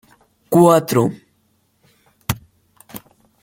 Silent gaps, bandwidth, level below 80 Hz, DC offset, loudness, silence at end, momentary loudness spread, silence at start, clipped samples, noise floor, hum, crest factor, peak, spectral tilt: none; 17 kHz; -50 dBFS; under 0.1%; -16 LUFS; 0.45 s; 25 LU; 0.5 s; under 0.1%; -63 dBFS; none; 18 dB; -2 dBFS; -6.5 dB/octave